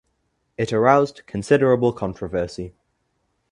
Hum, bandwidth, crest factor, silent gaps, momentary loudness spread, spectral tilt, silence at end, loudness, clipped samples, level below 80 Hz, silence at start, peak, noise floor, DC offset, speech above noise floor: none; 11 kHz; 22 dB; none; 17 LU; -7 dB/octave; 0.85 s; -20 LUFS; under 0.1%; -50 dBFS; 0.6 s; 0 dBFS; -71 dBFS; under 0.1%; 51 dB